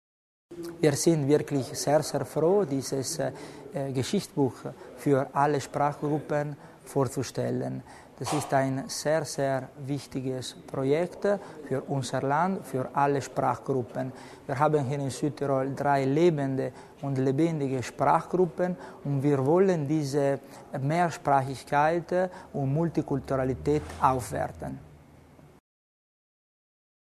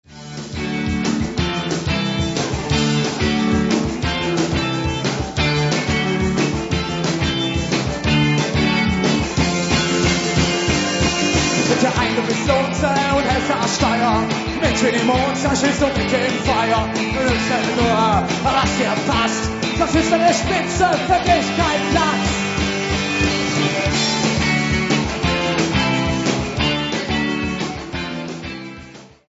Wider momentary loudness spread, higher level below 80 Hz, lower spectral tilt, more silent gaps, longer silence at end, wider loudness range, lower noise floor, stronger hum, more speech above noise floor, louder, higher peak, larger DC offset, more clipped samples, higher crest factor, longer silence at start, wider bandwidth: first, 11 LU vs 5 LU; second, -58 dBFS vs -32 dBFS; first, -6 dB/octave vs -4.5 dB/octave; neither; first, 2.05 s vs 0.25 s; about the same, 4 LU vs 2 LU; first, -53 dBFS vs -40 dBFS; neither; first, 26 dB vs 22 dB; second, -28 LUFS vs -18 LUFS; second, -8 dBFS vs -2 dBFS; neither; neither; about the same, 20 dB vs 16 dB; first, 0.5 s vs 0.1 s; first, 13.5 kHz vs 8 kHz